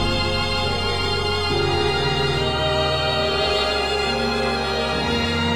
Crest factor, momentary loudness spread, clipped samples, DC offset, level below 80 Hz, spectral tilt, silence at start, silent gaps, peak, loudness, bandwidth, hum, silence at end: 14 dB; 2 LU; under 0.1%; under 0.1%; -34 dBFS; -4.5 dB/octave; 0 s; none; -8 dBFS; -20 LUFS; 16 kHz; none; 0 s